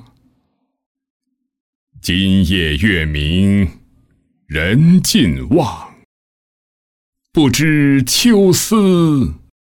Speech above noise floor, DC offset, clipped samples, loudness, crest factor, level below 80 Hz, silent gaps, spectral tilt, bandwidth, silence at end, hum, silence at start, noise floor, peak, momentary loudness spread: 53 dB; under 0.1%; under 0.1%; -13 LUFS; 14 dB; -34 dBFS; 6.05-7.13 s; -5 dB/octave; 18 kHz; 0.25 s; none; 2.05 s; -66 dBFS; -2 dBFS; 10 LU